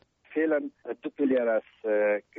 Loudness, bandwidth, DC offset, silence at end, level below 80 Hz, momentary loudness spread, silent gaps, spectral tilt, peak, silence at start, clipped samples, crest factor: -28 LUFS; 3.9 kHz; under 0.1%; 0.2 s; -76 dBFS; 12 LU; none; -4.5 dB/octave; -16 dBFS; 0.3 s; under 0.1%; 12 dB